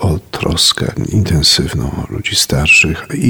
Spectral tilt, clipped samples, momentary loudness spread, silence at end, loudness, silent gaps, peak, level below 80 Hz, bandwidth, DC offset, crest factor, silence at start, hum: -3.5 dB/octave; under 0.1%; 11 LU; 0 s; -12 LUFS; none; 0 dBFS; -28 dBFS; over 20 kHz; under 0.1%; 14 dB; 0 s; none